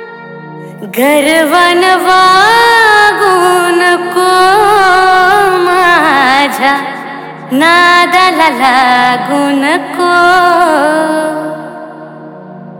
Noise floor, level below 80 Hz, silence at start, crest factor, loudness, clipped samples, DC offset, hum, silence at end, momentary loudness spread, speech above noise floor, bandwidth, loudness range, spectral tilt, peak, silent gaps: -28 dBFS; -48 dBFS; 0 s; 8 dB; -7 LUFS; under 0.1%; under 0.1%; none; 0 s; 18 LU; 21 dB; 19 kHz; 3 LU; -3 dB/octave; 0 dBFS; none